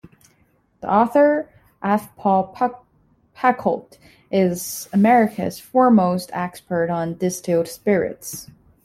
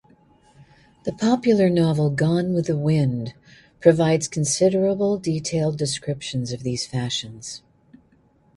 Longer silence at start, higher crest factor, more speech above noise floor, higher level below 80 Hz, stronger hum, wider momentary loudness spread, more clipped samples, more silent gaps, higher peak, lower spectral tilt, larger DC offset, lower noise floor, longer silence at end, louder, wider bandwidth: first, 0.8 s vs 0.6 s; about the same, 18 dB vs 20 dB; first, 42 dB vs 38 dB; second, -60 dBFS vs -54 dBFS; neither; about the same, 13 LU vs 13 LU; neither; neither; about the same, -4 dBFS vs -2 dBFS; about the same, -6 dB/octave vs -5.5 dB/octave; neither; about the same, -61 dBFS vs -59 dBFS; second, 0.4 s vs 1 s; about the same, -20 LUFS vs -21 LUFS; first, 16 kHz vs 11.5 kHz